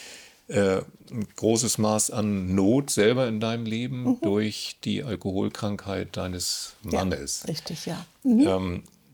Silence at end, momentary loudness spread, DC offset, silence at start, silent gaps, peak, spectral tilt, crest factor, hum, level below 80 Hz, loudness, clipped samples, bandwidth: 0.25 s; 11 LU; under 0.1%; 0 s; none; -8 dBFS; -4.5 dB/octave; 18 dB; none; -58 dBFS; -26 LUFS; under 0.1%; over 20 kHz